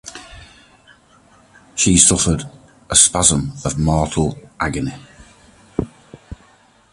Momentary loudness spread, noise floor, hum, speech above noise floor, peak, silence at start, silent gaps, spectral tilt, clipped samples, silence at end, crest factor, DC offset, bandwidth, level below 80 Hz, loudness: 19 LU; -52 dBFS; none; 36 dB; 0 dBFS; 0.05 s; none; -3 dB/octave; under 0.1%; 0.6 s; 20 dB; under 0.1%; 16 kHz; -36 dBFS; -16 LUFS